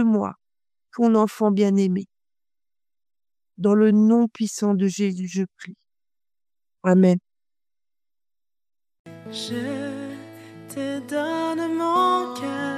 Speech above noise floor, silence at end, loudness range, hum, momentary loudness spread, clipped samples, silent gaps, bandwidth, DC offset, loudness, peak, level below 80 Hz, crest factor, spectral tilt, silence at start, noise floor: over 69 dB; 0 s; 10 LU; none; 19 LU; under 0.1%; 8.99-9.05 s; 14 kHz; under 0.1%; -22 LUFS; -6 dBFS; -74 dBFS; 18 dB; -6.5 dB/octave; 0 s; under -90 dBFS